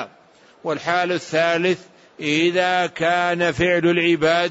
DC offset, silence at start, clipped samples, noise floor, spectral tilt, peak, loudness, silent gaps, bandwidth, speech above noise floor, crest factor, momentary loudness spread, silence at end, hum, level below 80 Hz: under 0.1%; 0 s; under 0.1%; -51 dBFS; -5 dB/octave; -6 dBFS; -19 LUFS; none; 8 kHz; 32 dB; 14 dB; 10 LU; 0 s; none; -54 dBFS